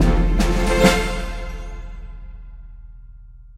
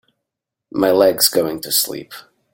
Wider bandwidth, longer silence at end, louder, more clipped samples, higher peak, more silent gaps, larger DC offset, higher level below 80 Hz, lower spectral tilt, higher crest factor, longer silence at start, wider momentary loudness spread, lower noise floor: second, 15 kHz vs 17 kHz; second, 0.05 s vs 0.3 s; second, -19 LUFS vs -16 LUFS; neither; about the same, 0 dBFS vs 0 dBFS; neither; neither; first, -24 dBFS vs -58 dBFS; first, -5 dB/octave vs -2.5 dB/octave; about the same, 20 dB vs 18 dB; second, 0 s vs 0.75 s; first, 25 LU vs 16 LU; second, -41 dBFS vs -82 dBFS